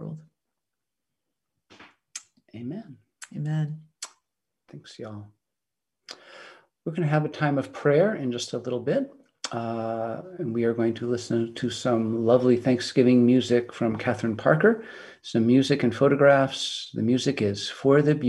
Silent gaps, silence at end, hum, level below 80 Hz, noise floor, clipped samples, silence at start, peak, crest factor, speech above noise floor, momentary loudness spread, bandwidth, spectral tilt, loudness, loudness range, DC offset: none; 0 s; none; -68 dBFS; -87 dBFS; under 0.1%; 0 s; -6 dBFS; 20 dB; 64 dB; 21 LU; 11.5 kHz; -6 dB/octave; -24 LUFS; 14 LU; under 0.1%